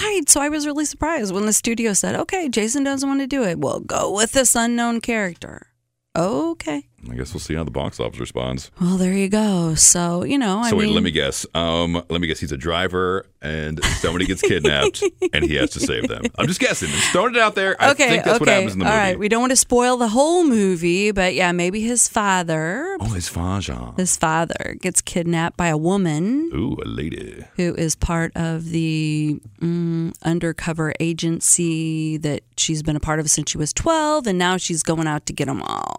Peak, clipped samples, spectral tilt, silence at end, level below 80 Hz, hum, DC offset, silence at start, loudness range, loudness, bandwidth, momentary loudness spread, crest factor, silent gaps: 0 dBFS; under 0.1%; -3.5 dB/octave; 0.05 s; -40 dBFS; none; under 0.1%; 0 s; 6 LU; -19 LUFS; 16 kHz; 10 LU; 20 dB; none